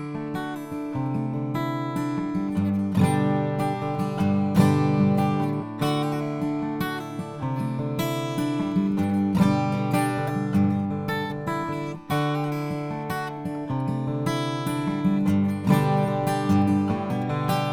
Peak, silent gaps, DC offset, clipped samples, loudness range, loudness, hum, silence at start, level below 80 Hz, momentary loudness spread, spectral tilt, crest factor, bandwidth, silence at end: -4 dBFS; none; under 0.1%; under 0.1%; 5 LU; -25 LUFS; none; 0 s; -56 dBFS; 9 LU; -7 dB/octave; 20 dB; 17.5 kHz; 0 s